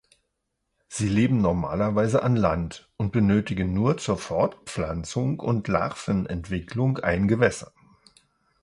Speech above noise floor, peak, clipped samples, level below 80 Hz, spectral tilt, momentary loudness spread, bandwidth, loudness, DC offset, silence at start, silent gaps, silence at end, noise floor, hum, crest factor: 54 dB; -6 dBFS; under 0.1%; -44 dBFS; -7 dB/octave; 9 LU; 11.5 kHz; -25 LUFS; under 0.1%; 0.9 s; none; 0.95 s; -78 dBFS; none; 20 dB